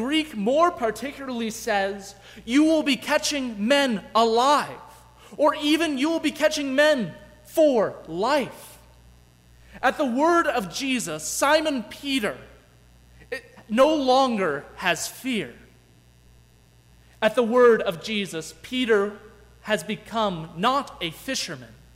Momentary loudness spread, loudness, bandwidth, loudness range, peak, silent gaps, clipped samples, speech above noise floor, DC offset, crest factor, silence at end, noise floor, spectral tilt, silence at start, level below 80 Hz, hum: 13 LU; -23 LUFS; 16 kHz; 4 LU; -6 dBFS; none; under 0.1%; 32 dB; under 0.1%; 18 dB; 0.3 s; -55 dBFS; -3.5 dB/octave; 0 s; -56 dBFS; 60 Hz at -55 dBFS